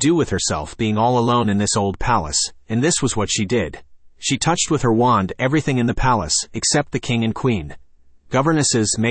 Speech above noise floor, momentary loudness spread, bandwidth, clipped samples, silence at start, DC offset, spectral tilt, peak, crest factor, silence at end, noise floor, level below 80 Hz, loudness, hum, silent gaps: 28 dB; 6 LU; 8.8 kHz; under 0.1%; 0 s; under 0.1%; -4 dB/octave; -4 dBFS; 14 dB; 0 s; -47 dBFS; -38 dBFS; -19 LUFS; none; none